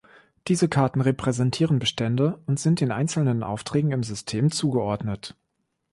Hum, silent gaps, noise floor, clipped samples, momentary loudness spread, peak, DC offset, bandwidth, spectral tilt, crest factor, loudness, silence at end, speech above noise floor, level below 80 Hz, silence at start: none; none; -76 dBFS; under 0.1%; 7 LU; -8 dBFS; under 0.1%; 11.5 kHz; -6 dB/octave; 16 dB; -24 LUFS; 0.6 s; 53 dB; -54 dBFS; 0.45 s